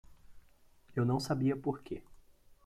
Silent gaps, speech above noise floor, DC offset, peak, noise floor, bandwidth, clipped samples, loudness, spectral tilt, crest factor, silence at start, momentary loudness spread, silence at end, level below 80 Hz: none; 29 dB; under 0.1%; -22 dBFS; -63 dBFS; 14.5 kHz; under 0.1%; -35 LUFS; -7 dB/octave; 16 dB; 0.1 s; 13 LU; 0.45 s; -62 dBFS